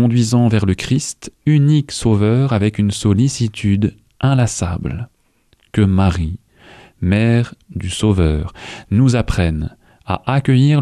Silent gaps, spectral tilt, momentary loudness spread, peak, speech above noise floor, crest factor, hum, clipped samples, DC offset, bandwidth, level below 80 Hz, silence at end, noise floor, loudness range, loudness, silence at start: none; -6.5 dB/octave; 11 LU; -4 dBFS; 43 dB; 12 dB; none; under 0.1%; under 0.1%; 12 kHz; -32 dBFS; 0 s; -58 dBFS; 3 LU; -16 LUFS; 0 s